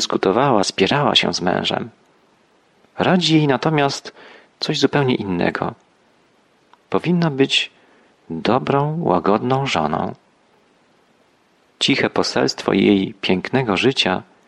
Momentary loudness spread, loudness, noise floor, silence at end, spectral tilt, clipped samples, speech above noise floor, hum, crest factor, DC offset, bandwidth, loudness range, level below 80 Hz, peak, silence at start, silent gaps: 10 LU; -18 LUFS; -58 dBFS; 0.25 s; -5 dB/octave; under 0.1%; 40 dB; none; 18 dB; under 0.1%; 11.5 kHz; 4 LU; -56 dBFS; -2 dBFS; 0 s; none